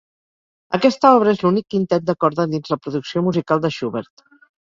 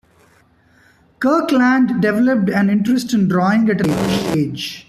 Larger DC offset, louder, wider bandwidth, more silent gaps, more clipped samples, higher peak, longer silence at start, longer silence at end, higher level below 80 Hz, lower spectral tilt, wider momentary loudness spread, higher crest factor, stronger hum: neither; about the same, -18 LUFS vs -16 LUFS; second, 7.6 kHz vs 14 kHz; neither; neither; about the same, -2 dBFS vs -4 dBFS; second, 0.7 s vs 1.2 s; first, 0.65 s vs 0.05 s; second, -60 dBFS vs -50 dBFS; about the same, -7 dB/octave vs -6.5 dB/octave; first, 11 LU vs 5 LU; about the same, 16 dB vs 12 dB; neither